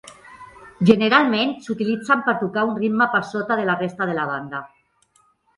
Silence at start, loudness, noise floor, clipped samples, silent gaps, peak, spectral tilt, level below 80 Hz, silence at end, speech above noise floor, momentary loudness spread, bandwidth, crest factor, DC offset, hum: 0.05 s; -20 LUFS; -61 dBFS; under 0.1%; none; 0 dBFS; -6 dB/octave; -62 dBFS; 0.9 s; 41 dB; 9 LU; 11.5 kHz; 20 dB; under 0.1%; none